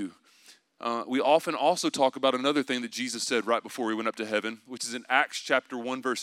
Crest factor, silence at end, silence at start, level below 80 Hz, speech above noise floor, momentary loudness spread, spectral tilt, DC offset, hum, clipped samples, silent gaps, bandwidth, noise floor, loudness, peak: 20 dB; 0 s; 0 s; -88 dBFS; 30 dB; 10 LU; -2.5 dB/octave; under 0.1%; none; under 0.1%; none; 16 kHz; -58 dBFS; -28 LUFS; -8 dBFS